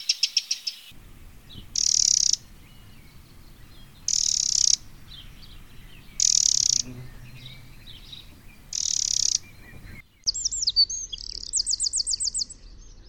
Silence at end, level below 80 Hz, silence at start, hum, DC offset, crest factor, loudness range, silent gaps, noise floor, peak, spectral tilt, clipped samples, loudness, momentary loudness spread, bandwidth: 0 s; -48 dBFS; 0 s; none; 0.1%; 24 dB; 4 LU; none; -48 dBFS; -4 dBFS; 1.5 dB/octave; under 0.1%; -22 LUFS; 25 LU; 19.5 kHz